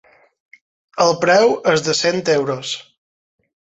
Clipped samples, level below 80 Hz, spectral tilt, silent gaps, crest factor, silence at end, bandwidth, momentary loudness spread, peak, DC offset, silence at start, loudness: under 0.1%; -60 dBFS; -3.5 dB/octave; none; 16 dB; 0.8 s; 8.2 kHz; 13 LU; -2 dBFS; under 0.1%; 0.95 s; -16 LUFS